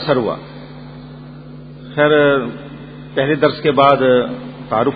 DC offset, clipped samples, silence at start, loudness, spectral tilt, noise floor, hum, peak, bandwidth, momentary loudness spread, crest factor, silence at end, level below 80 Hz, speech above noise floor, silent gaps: under 0.1%; under 0.1%; 0 s; -15 LUFS; -9 dB/octave; -34 dBFS; none; 0 dBFS; 5 kHz; 23 LU; 16 dB; 0 s; -48 dBFS; 20 dB; none